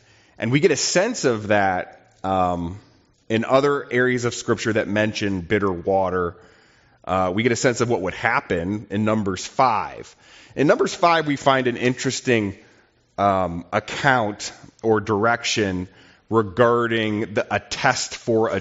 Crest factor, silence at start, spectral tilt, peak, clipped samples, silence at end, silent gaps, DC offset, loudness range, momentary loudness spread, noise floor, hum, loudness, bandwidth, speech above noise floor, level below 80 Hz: 20 dB; 0.4 s; -4 dB/octave; -2 dBFS; under 0.1%; 0 s; none; under 0.1%; 2 LU; 10 LU; -57 dBFS; none; -21 LUFS; 8 kHz; 36 dB; -56 dBFS